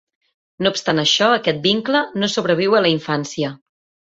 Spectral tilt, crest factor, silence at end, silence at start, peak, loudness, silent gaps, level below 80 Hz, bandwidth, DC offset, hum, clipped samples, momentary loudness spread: -4 dB/octave; 16 dB; 0.55 s; 0.6 s; -2 dBFS; -18 LUFS; none; -60 dBFS; 8 kHz; under 0.1%; none; under 0.1%; 8 LU